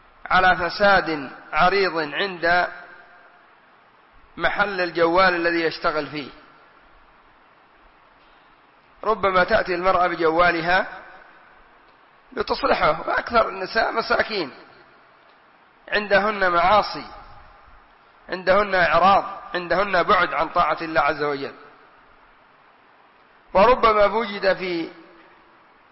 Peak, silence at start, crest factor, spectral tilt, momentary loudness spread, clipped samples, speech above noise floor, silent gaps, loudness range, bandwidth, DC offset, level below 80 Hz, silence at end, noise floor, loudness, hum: -8 dBFS; 0.25 s; 16 dB; -8 dB/octave; 13 LU; under 0.1%; 34 dB; none; 5 LU; 6 kHz; under 0.1%; -46 dBFS; 0.9 s; -54 dBFS; -20 LUFS; none